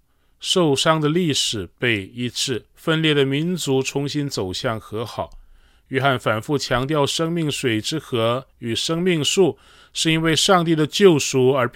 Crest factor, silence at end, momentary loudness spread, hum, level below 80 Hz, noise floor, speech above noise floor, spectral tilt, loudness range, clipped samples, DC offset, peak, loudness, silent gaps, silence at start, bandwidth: 18 dB; 0.05 s; 11 LU; none; -50 dBFS; -50 dBFS; 30 dB; -4.5 dB/octave; 5 LU; under 0.1%; under 0.1%; -2 dBFS; -20 LUFS; none; 0.4 s; 17 kHz